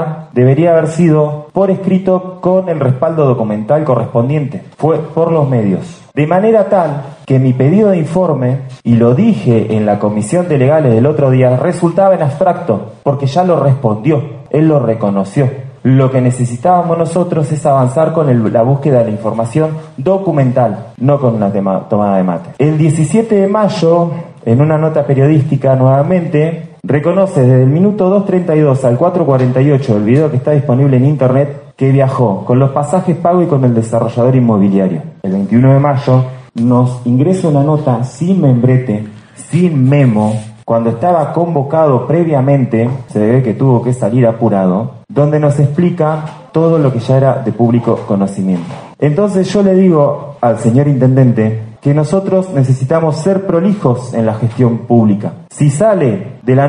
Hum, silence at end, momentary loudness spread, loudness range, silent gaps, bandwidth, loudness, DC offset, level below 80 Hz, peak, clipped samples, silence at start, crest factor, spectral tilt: none; 0 s; 6 LU; 2 LU; none; 10.5 kHz; -11 LUFS; under 0.1%; -50 dBFS; 0 dBFS; under 0.1%; 0 s; 10 dB; -8.5 dB/octave